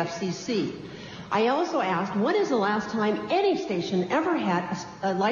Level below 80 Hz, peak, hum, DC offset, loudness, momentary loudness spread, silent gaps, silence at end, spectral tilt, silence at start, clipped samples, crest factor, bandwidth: -64 dBFS; -12 dBFS; none; under 0.1%; -26 LUFS; 7 LU; none; 0 s; -5.5 dB/octave; 0 s; under 0.1%; 14 dB; 7.4 kHz